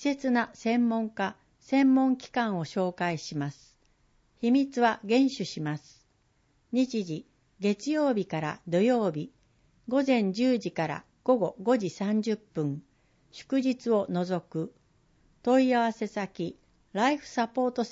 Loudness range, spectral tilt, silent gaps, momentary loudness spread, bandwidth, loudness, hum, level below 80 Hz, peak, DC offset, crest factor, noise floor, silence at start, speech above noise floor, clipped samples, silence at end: 3 LU; -6 dB/octave; none; 11 LU; 7.8 kHz; -28 LUFS; none; -70 dBFS; -12 dBFS; under 0.1%; 18 dB; -69 dBFS; 0 s; 42 dB; under 0.1%; 0 s